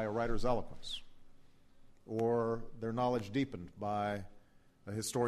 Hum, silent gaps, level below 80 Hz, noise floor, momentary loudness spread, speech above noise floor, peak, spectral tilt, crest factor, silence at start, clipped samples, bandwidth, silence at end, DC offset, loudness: none; none; -50 dBFS; -61 dBFS; 10 LU; 26 dB; -20 dBFS; -5.5 dB/octave; 16 dB; 0 s; under 0.1%; 13 kHz; 0 s; under 0.1%; -37 LUFS